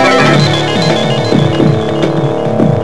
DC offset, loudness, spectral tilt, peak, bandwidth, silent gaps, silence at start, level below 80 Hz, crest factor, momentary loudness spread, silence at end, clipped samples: 4%; -10 LUFS; -6 dB/octave; 0 dBFS; 11 kHz; none; 0 s; -42 dBFS; 10 dB; 5 LU; 0 s; 0.2%